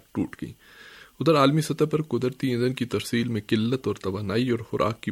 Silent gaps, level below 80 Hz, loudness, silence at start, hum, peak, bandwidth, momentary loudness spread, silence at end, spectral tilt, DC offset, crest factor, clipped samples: none; -58 dBFS; -25 LUFS; 0.15 s; none; -6 dBFS; 16 kHz; 10 LU; 0 s; -6.5 dB/octave; under 0.1%; 20 dB; under 0.1%